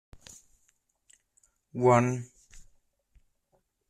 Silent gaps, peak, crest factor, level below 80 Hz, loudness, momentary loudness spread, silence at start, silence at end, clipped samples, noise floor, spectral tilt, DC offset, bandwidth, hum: none; -10 dBFS; 22 dB; -62 dBFS; -26 LUFS; 28 LU; 1.75 s; 1.3 s; under 0.1%; -74 dBFS; -7 dB/octave; under 0.1%; 10.5 kHz; none